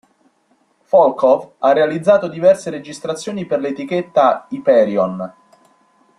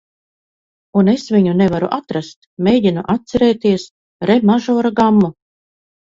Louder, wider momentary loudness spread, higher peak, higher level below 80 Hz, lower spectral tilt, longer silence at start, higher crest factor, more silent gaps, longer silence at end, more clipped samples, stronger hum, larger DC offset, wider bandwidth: about the same, -16 LUFS vs -15 LUFS; first, 12 LU vs 9 LU; about the same, -2 dBFS vs 0 dBFS; second, -62 dBFS vs -50 dBFS; second, -6 dB/octave vs -7.5 dB/octave; about the same, 0.95 s vs 0.95 s; about the same, 16 dB vs 16 dB; second, none vs 2.36-2.57 s, 3.91-4.20 s; first, 0.9 s vs 0.7 s; neither; neither; neither; first, 11 kHz vs 7.6 kHz